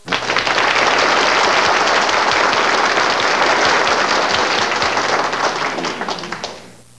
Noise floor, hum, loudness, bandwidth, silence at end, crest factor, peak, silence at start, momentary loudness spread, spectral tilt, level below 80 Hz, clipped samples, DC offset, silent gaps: -37 dBFS; none; -14 LUFS; 11 kHz; 0.25 s; 16 dB; 0 dBFS; 0.05 s; 9 LU; -1.5 dB/octave; -50 dBFS; under 0.1%; 0.6%; none